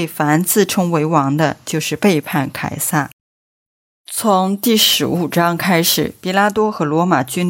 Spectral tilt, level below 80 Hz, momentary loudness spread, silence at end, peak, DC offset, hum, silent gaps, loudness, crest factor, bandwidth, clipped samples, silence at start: -4 dB/octave; -56 dBFS; 8 LU; 0 s; 0 dBFS; under 0.1%; none; 3.13-4.05 s; -15 LUFS; 16 dB; 16.5 kHz; under 0.1%; 0 s